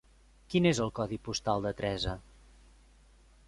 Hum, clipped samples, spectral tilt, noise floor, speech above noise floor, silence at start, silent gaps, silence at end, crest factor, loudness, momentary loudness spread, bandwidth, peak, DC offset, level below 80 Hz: none; under 0.1%; -5.5 dB/octave; -60 dBFS; 29 dB; 0.5 s; none; 1.25 s; 20 dB; -32 LUFS; 9 LU; 11.5 kHz; -14 dBFS; under 0.1%; -52 dBFS